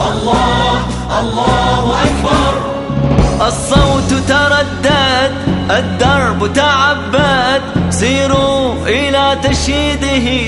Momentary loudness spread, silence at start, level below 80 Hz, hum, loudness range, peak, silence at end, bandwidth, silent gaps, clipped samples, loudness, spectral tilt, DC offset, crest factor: 4 LU; 0 s; -24 dBFS; none; 1 LU; -2 dBFS; 0 s; 11.5 kHz; none; under 0.1%; -12 LUFS; -4.5 dB/octave; under 0.1%; 10 dB